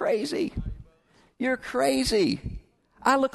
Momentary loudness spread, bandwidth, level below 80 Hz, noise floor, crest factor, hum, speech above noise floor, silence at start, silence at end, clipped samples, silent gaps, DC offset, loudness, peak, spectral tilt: 17 LU; 12.5 kHz; -44 dBFS; -62 dBFS; 20 dB; none; 37 dB; 0 s; 0.05 s; under 0.1%; none; under 0.1%; -26 LUFS; -8 dBFS; -4.5 dB/octave